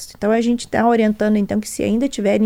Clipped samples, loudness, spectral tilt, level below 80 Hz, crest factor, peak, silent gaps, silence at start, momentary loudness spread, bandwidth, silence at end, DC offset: under 0.1%; -18 LUFS; -5.5 dB/octave; -46 dBFS; 14 dB; -4 dBFS; none; 0 s; 5 LU; 16 kHz; 0 s; under 0.1%